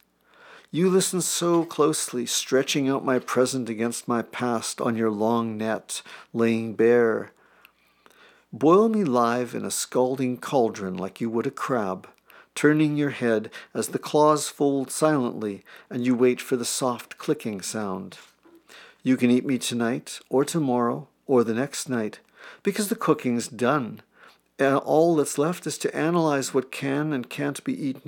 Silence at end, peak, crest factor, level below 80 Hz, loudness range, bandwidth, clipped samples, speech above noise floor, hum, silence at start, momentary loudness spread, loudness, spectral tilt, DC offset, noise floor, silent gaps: 0.1 s; -6 dBFS; 18 dB; -80 dBFS; 4 LU; 18.5 kHz; under 0.1%; 35 dB; none; 0.5 s; 10 LU; -24 LUFS; -4.5 dB/octave; under 0.1%; -59 dBFS; none